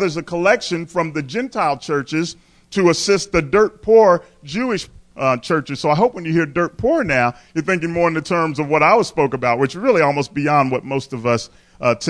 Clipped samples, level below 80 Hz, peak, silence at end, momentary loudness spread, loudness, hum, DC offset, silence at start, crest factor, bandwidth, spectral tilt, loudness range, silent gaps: under 0.1%; -48 dBFS; -2 dBFS; 0 s; 9 LU; -18 LUFS; none; under 0.1%; 0 s; 16 dB; 11 kHz; -5.5 dB/octave; 2 LU; none